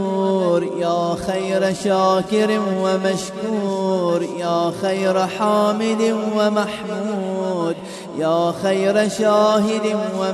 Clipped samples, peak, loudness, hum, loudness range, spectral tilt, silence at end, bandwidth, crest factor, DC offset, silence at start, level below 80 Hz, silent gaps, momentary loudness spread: under 0.1%; -4 dBFS; -19 LUFS; none; 1 LU; -5.5 dB/octave; 0 s; 13.5 kHz; 14 dB; under 0.1%; 0 s; -56 dBFS; none; 6 LU